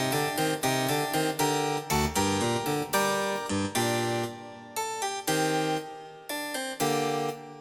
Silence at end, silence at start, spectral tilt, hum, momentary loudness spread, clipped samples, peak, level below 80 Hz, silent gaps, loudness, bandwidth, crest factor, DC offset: 0 s; 0 s; -3.5 dB/octave; none; 8 LU; under 0.1%; -12 dBFS; -52 dBFS; none; -28 LUFS; 18 kHz; 16 dB; under 0.1%